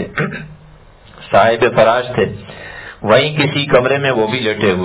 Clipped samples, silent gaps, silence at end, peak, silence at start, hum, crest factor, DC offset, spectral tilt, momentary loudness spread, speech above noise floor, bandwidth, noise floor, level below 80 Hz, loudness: under 0.1%; none; 0 s; 0 dBFS; 0 s; none; 14 dB; under 0.1%; -9.5 dB/octave; 18 LU; 28 dB; 4 kHz; -41 dBFS; -44 dBFS; -14 LUFS